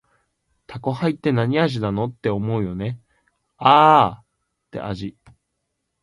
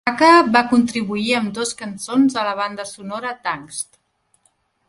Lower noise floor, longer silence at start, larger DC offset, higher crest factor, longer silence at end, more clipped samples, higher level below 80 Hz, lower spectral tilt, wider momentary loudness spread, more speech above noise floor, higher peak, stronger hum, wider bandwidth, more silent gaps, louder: first, -76 dBFS vs -64 dBFS; first, 0.7 s vs 0.05 s; neither; about the same, 22 dB vs 18 dB; second, 0.9 s vs 1.05 s; neither; first, -52 dBFS vs -60 dBFS; first, -7.5 dB/octave vs -3.5 dB/octave; about the same, 19 LU vs 17 LU; first, 57 dB vs 46 dB; about the same, 0 dBFS vs 0 dBFS; neither; about the same, 11.5 kHz vs 11.5 kHz; neither; about the same, -19 LUFS vs -18 LUFS